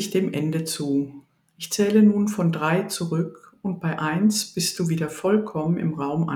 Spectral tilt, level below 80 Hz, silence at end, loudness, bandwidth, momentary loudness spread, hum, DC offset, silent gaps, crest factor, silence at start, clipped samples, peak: -5.5 dB/octave; -64 dBFS; 0 s; -23 LUFS; 17.5 kHz; 10 LU; none; under 0.1%; none; 16 dB; 0 s; under 0.1%; -6 dBFS